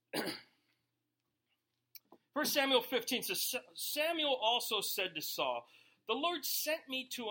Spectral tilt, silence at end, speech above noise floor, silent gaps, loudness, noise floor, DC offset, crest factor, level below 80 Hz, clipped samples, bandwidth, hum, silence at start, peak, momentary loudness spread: -1 dB/octave; 0 s; 50 dB; none; -35 LUFS; -86 dBFS; under 0.1%; 22 dB; -88 dBFS; under 0.1%; 17 kHz; none; 0.15 s; -16 dBFS; 9 LU